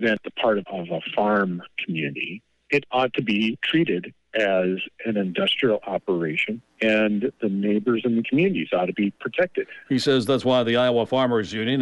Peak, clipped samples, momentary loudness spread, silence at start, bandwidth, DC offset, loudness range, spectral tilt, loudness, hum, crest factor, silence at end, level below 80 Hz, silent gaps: -10 dBFS; under 0.1%; 7 LU; 0 s; 11.5 kHz; under 0.1%; 2 LU; -6 dB/octave; -23 LUFS; none; 14 dB; 0 s; -66 dBFS; none